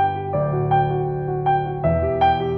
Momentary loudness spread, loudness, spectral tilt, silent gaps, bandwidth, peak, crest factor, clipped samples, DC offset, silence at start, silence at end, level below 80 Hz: 5 LU; -21 LUFS; -10 dB/octave; none; 5.2 kHz; -6 dBFS; 12 dB; under 0.1%; under 0.1%; 0 s; 0 s; -38 dBFS